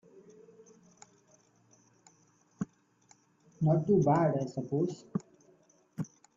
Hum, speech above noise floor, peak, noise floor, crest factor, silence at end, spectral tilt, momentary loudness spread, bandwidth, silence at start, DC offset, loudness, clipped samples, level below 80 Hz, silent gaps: none; 38 dB; -14 dBFS; -67 dBFS; 20 dB; 0.3 s; -9 dB/octave; 16 LU; 7.6 kHz; 2.6 s; under 0.1%; -31 LUFS; under 0.1%; -70 dBFS; none